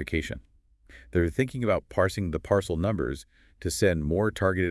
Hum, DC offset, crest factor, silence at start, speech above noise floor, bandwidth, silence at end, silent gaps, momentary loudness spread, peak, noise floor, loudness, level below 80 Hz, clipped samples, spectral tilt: none; under 0.1%; 18 dB; 0 s; 27 dB; 12 kHz; 0 s; none; 9 LU; -10 dBFS; -54 dBFS; -27 LUFS; -46 dBFS; under 0.1%; -6 dB/octave